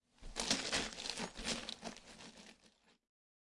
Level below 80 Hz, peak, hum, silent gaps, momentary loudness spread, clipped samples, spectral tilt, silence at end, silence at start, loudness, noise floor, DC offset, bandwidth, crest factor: -60 dBFS; -18 dBFS; none; none; 20 LU; under 0.1%; -1.5 dB/octave; 0.85 s; 0.2 s; -40 LUFS; -71 dBFS; under 0.1%; 11.5 kHz; 26 dB